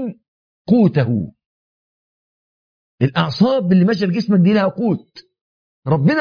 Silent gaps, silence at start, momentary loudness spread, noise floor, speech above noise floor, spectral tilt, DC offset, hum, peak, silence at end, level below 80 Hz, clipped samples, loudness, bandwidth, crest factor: 0.28-0.65 s, 1.46-2.98 s, 5.41-5.83 s; 0 s; 12 LU; under -90 dBFS; over 75 dB; -8.5 dB/octave; under 0.1%; none; -2 dBFS; 0 s; -56 dBFS; under 0.1%; -16 LUFS; 5.2 kHz; 16 dB